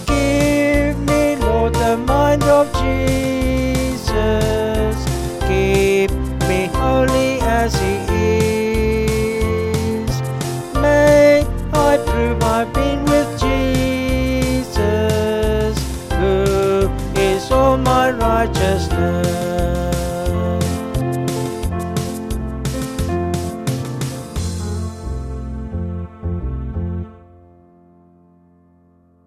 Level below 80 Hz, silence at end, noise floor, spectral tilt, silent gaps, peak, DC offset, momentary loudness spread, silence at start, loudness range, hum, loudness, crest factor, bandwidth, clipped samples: -26 dBFS; 2.1 s; -53 dBFS; -6 dB/octave; none; -2 dBFS; 0.1%; 10 LU; 0 s; 10 LU; none; -18 LUFS; 16 dB; 15 kHz; under 0.1%